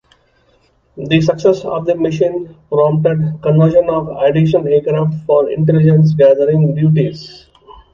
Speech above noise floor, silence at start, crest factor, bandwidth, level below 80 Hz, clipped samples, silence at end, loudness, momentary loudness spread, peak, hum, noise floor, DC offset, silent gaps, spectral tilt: 43 dB; 0.95 s; 12 dB; 7 kHz; -48 dBFS; under 0.1%; 0.2 s; -13 LUFS; 8 LU; 0 dBFS; none; -55 dBFS; under 0.1%; none; -9 dB/octave